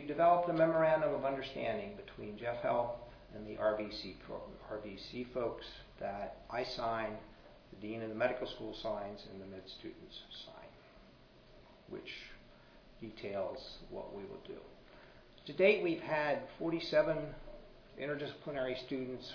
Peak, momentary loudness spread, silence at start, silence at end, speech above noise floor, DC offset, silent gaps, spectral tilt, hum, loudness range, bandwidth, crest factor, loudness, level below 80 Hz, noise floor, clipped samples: -16 dBFS; 21 LU; 0 s; 0 s; 23 dB; under 0.1%; none; -3.5 dB/octave; none; 13 LU; 5.4 kHz; 22 dB; -37 LUFS; -62 dBFS; -61 dBFS; under 0.1%